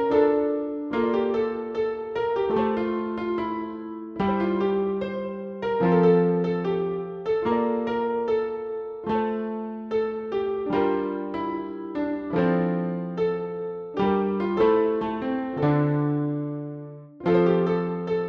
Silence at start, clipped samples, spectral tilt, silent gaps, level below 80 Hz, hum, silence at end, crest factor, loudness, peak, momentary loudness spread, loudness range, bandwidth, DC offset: 0 s; under 0.1%; -9.5 dB/octave; none; -56 dBFS; none; 0 s; 16 dB; -25 LUFS; -8 dBFS; 11 LU; 3 LU; 6 kHz; under 0.1%